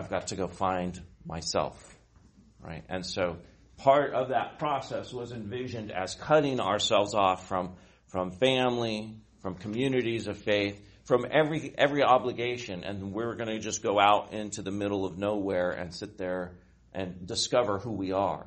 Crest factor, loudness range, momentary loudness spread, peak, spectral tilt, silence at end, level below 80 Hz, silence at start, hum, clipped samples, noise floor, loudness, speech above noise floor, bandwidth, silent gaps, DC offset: 22 dB; 4 LU; 14 LU; -8 dBFS; -4.5 dB/octave; 0 s; -58 dBFS; 0 s; none; under 0.1%; -58 dBFS; -29 LUFS; 29 dB; 8.4 kHz; none; under 0.1%